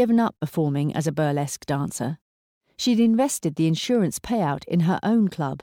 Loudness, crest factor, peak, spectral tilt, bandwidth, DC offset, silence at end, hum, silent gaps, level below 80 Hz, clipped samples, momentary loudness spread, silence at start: -23 LUFS; 12 dB; -10 dBFS; -6 dB/octave; 17 kHz; under 0.1%; 0.05 s; none; 2.21-2.61 s; -56 dBFS; under 0.1%; 7 LU; 0 s